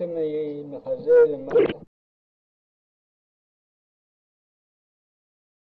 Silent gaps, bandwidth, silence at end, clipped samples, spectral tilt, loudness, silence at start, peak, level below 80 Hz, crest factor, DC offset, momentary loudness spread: none; 4.3 kHz; 3.95 s; under 0.1%; -8.5 dB/octave; -22 LUFS; 0 s; -8 dBFS; -66 dBFS; 18 dB; under 0.1%; 15 LU